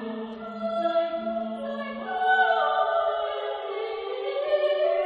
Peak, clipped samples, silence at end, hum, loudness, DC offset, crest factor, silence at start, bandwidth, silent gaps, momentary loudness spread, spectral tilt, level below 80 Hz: -10 dBFS; under 0.1%; 0 s; none; -27 LUFS; under 0.1%; 16 dB; 0 s; 5.2 kHz; none; 11 LU; -5.5 dB/octave; -68 dBFS